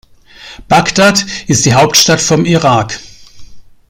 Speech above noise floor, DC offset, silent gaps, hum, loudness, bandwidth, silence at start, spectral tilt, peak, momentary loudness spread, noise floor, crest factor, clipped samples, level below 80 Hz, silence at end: 26 dB; under 0.1%; none; none; -9 LUFS; 19 kHz; 0.4 s; -3.5 dB/octave; 0 dBFS; 7 LU; -35 dBFS; 12 dB; 0.1%; -40 dBFS; 0.3 s